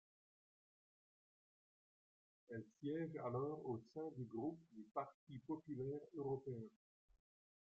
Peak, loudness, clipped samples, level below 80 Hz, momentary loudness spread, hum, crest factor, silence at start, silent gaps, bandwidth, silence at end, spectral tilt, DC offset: -32 dBFS; -49 LUFS; under 0.1%; -86 dBFS; 9 LU; none; 18 dB; 2.5 s; 5.14-5.27 s; 7.6 kHz; 1.05 s; -8.5 dB/octave; under 0.1%